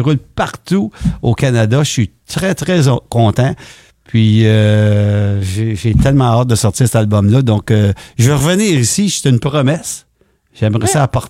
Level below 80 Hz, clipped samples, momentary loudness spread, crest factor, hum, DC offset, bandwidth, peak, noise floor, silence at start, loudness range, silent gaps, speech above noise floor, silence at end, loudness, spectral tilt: -32 dBFS; under 0.1%; 7 LU; 12 dB; none; under 0.1%; 15 kHz; 0 dBFS; -56 dBFS; 0 s; 2 LU; none; 44 dB; 0 s; -13 LUFS; -6 dB/octave